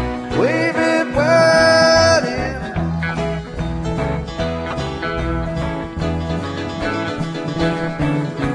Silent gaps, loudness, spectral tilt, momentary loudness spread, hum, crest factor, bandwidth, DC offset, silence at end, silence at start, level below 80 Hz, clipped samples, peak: none; -18 LUFS; -5 dB/octave; 12 LU; none; 18 dB; 10.5 kHz; under 0.1%; 0 s; 0 s; -32 dBFS; under 0.1%; 0 dBFS